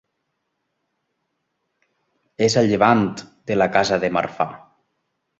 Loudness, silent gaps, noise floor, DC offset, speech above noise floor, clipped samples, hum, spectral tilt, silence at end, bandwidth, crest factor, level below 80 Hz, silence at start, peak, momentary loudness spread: -19 LUFS; none; -75 dBFS; under 0.1%; 57 dB; under 0.1%; none; -5 dB/octave; 0.8 s; 8.2 kHz; 20 dB; -56 dBFS; 2.4 s; -2 dBFS; 10 LU